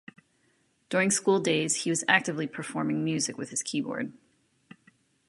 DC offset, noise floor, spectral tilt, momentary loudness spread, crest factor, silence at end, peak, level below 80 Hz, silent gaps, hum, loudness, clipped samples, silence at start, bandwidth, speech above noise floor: under 0.1%; -69 dBFS; -3.5 dB/octave; 10 LU; 24 dB; 1.15 s; -6 dBFS; -76 dBFS; none; none; -27 LUFS; under 0.1%; 0.9 s; 11.5 kHz; 42 dB